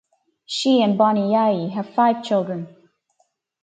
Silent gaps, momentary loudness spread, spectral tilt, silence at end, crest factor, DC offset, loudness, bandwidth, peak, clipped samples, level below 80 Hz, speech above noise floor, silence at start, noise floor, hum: none; 12 LU; -6 dB/octave; 0.95 s; 18 dB; under 0.1%; -20 LUFS; 9.2 kHz; -4 dBFS; under 0.1%; -70 dBFS; 49 dB; 0.5 s; -67 dBFS; none